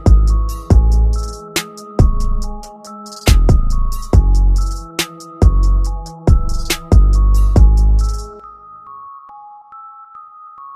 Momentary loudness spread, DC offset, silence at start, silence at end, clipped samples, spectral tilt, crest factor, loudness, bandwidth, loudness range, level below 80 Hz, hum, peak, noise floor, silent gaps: 23 LU; under 0.1%; 0 s; 0 s; under 0.1%; -6 dB/octave; 12 dB; -16 LUFS; 14.5 kHz; 3 LU; -14 dBFS; none; 0 dBFS; -37 dBFS; none